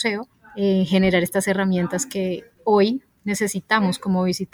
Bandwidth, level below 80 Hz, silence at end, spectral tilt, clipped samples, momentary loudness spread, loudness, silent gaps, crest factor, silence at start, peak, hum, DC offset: 18.5 kHz; -54 dBFS; 0.1 s; -5 dB/octave; under 0.1%; 9 LU; -21 LUFS; none; 16 dB; 0 s; -6 dBFS; none; under 0.1%